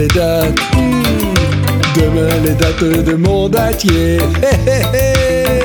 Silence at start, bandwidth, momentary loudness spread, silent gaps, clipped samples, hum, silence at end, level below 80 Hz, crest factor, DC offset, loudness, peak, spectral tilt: 0 s; 19.5 kHz; 1 LU; none; under 0.1%; none; 0 s; -22 dBFS; 12 dB; under 0.1%; -12 LUFS; 0 dBFS; -5.5 dB/octave